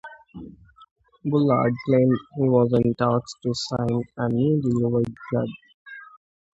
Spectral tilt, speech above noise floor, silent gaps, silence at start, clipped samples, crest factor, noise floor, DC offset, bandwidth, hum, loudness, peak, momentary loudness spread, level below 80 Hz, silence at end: -7.5 dB/octave; 23 dB; 0.91-0.96 s, 5.74-5.86 s; 0.05 s; under 0.1%; 18 dB; -45 dBFS; under 0.1%; 8 kHz; none; -23 LUFS; -6 dBFS; 22 LU; -54 dBFS; 0.55 s